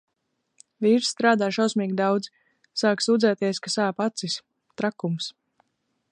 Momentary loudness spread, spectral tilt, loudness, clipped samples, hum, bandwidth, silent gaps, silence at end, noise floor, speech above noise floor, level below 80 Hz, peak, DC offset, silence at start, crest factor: 10 LU; -4.5 dB/octave; -24 LUFS; under 0.1%; none; 10.5 kHz; none; 0.8 s; -77 dBFS; 53 dB; -76 dBFS; -6 dBFS; under 0.1%; 0.8 s; 20 dB